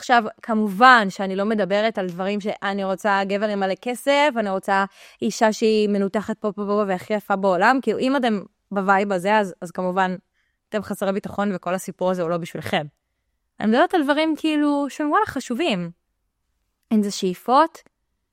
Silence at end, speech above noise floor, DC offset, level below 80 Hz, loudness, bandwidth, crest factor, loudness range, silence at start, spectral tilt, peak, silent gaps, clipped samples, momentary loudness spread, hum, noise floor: 0.65 s; 53 dB; under 0.1%; -64 dBFS; -21 LUFS; 16 kHz; 20 dB; 5 LU; 0 s; -5 dB/octave; 0 dBFS; none; under 0.1%; 9 LU; none; -74 dBFS